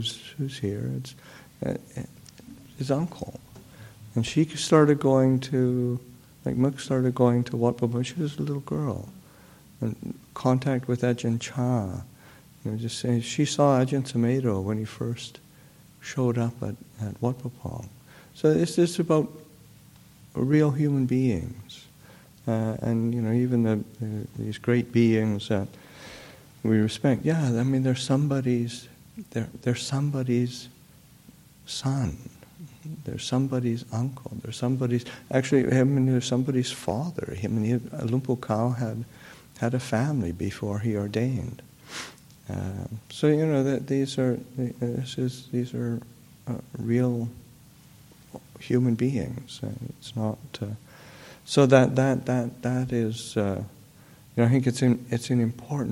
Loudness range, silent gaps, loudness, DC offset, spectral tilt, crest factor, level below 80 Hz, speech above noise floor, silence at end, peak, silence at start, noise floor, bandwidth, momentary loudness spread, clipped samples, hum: 6 LU; none; -26 LUFS; under 0.1%; -6.5 dB/octave; 22 dB; -58 dBFS; 28 dB; 0 s; -4 dBFS; 0 s; -53 dBFS; 16 kHz; 18 LU; under 0.1%; none